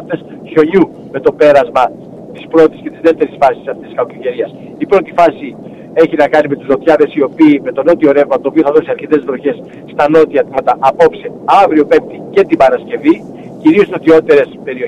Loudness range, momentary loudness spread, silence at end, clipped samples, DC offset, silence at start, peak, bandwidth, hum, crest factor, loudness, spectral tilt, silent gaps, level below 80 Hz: 3 LU; 13 LU; 0 s; under 0.1%; under 0.1%; 0 s; 0 dBFS; 9.2 kHz; none; 10 dB; -11 LUFS; -7 dB/octave; none; -50 dBFS